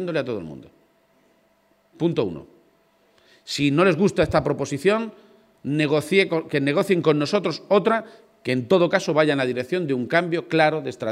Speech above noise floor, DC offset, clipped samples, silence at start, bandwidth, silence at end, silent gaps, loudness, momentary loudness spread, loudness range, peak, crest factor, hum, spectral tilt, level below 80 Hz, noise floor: 41 dB; under 0.1%; under 0.1%; 0 s; 15 kHz; 0 s; none; -22 LUFS; 10 LU; 7 LU; -4 dBFS; 20 dB; none; -6 dB/octave; -54 dBFS; -62 dBFS